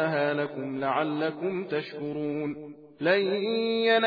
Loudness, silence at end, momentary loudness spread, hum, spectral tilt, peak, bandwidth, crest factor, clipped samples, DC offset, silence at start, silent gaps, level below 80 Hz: -28 LUFS; 0 s; 9 LU; none; -8 dB/octave; -10 dBFS; 5 kHz; 18 dB; under 0.1%; under 0.1%; 0 s; none; -74 dBFS